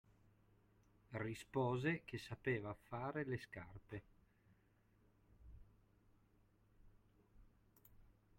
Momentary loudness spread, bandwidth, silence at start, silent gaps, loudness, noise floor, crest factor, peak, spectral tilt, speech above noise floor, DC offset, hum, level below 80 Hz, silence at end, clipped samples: 15 LU; 16.5 kHz; 1.1 s; none; -46 LUFS; -75 dBFS; 22 dB; -26 dBFS; -7 dB/octave; 31 dB; under 0.1%; none; -70 dBFS; 0.25 s; under 0.1%